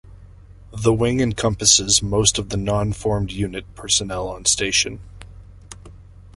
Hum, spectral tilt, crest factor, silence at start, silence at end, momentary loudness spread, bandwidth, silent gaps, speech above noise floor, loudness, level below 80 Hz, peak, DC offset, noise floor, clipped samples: none; -3 dB/octave; 20 dB; 0.05 s; 0.05 s; 13 LU; 11.5 kHz; none; 23 dB; -19 LUFS; -38 dBFS; 0 dBFS; under 0.1%; -43 dBFS; under 0.1%